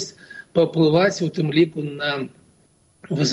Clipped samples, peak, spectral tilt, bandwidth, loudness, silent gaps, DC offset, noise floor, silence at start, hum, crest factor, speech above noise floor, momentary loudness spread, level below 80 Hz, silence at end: under 0.1%; -6 dBFS; -5.5 dB/octave; 10.5 kHz; -21 LUFS; none; under 0.1%; -59 dBFS; 0 s; none; 16 dB; 39 dB; 14 LU; -62 dBFS; 0 s